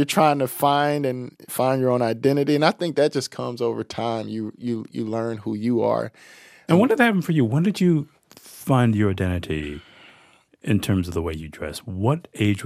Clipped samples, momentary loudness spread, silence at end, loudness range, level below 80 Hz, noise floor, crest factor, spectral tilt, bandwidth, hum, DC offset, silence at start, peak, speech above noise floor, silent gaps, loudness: under 0.1%; 13 LU; 0 s; 5 LU; -50 dBFS; -55 dBFS; 20 dB; -6.5 dB/octave; 15 kHz; none; under 0.1%; 0 s; -2 dBFS; 34 dB; none; -22 LUFS